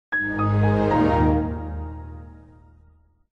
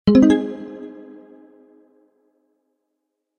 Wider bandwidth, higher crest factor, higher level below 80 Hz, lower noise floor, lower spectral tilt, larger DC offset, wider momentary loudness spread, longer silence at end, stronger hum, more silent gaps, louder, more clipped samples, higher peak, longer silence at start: second, 6.2 kHz vs 9 kHz; second, 14 dB vs 20 dB; first, -34 dBFS vs -50 dBFS; second, -56 dBFS vs -78 dBFS; first, -9.5 dB/octave vs -7.5 dB/octave; neither; second, 19 LU vs 28 LU; second, 0.95 s vs 2.5 s; neither; neither; second, -21 LUFS vs -16 LUFS; neither; second, -8 dBFS vs -2 dBFS; about the same, 0.1 s vs 0.05 s